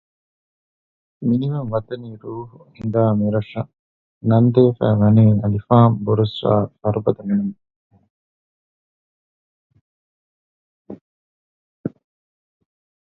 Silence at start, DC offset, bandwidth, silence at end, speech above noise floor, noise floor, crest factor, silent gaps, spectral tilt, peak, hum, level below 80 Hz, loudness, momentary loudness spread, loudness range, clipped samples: 1.2 s; under 0.1%; 4.3 kHz; 1.15 s; over 73 dB; under -90 dBFS; 20 dB; 3.79-4.21 s, 7.76-7.90 s, 8.10-9.70 s, 9.81-10.85 s, 11.01-11.84 s; -11.5 dB/octave; 0 dBFS; none; -50 dBFS; -18 LUFS; 18 LU; 24 LU; under 0.1%